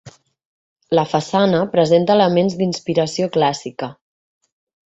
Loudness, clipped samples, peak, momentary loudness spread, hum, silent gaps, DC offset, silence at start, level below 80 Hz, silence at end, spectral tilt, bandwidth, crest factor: -17 LUFS; under 0.1%; -2 dBFS; 11 LU; none; 0.45-0.76 s; under 0.1%; 0.05 s; -58 dBFS; 0.95 s; -6 dB/octave; 8 kHz; 16 dB